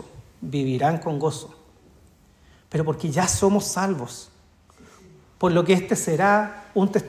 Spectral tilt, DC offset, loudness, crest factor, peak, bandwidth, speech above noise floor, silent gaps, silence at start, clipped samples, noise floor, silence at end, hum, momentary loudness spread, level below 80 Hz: -5 dB/octave; under 0.1%; -22 LUFS; 18 dB; -6 dBFS; 15.5 kHz; 33 dB; none; 0 s; under 0.1%; -55 dBFS; 0 s; none; 13 LU; -50 dBFS